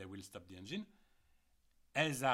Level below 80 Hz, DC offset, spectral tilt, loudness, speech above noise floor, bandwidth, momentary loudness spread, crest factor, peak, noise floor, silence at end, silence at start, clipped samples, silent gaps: -76 dBFS; under 0.1%; -4 dB/octave; -41 LUFS; 34 dB; 16.5 kHz; 17 LU; 22 dB; -20 dBFS; -73 dBFS; 0 s; 0 s; under 0.1%; none